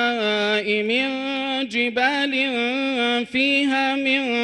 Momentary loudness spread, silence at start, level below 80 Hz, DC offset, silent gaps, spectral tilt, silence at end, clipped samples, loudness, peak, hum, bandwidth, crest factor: 4 LU; 0 s; -64 dBFS; under 0.1%; none; -3.5 dB/octave; 0 s; under 0.1%; -20 LUFS; -6 dBFS; none; 11 kHz; 16 dB